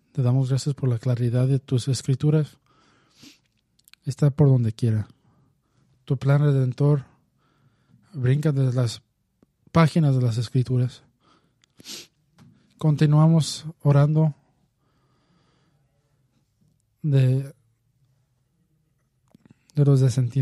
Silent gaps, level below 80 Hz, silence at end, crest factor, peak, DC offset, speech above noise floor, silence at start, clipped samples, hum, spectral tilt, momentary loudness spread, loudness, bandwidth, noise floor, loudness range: none; -58 dBFS; 0 s; 20 dB; -4 dBFS; under 0.1%; 48 dB; 0.15 s; under 0.1%; none; -7.5 dB/octave; 13 LU; -22 LUFS; 12 kHz; -69 dBFS; 6 LU